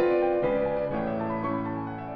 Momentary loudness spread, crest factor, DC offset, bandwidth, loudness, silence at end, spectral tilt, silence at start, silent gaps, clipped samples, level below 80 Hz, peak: 7 LU; 14 dB; under 0.1%; 5 kHz; -28 LUFS; 0 s; -10 dB/octave; 0 s; none; under 0.1%; -52 dBFS; -14 dBFS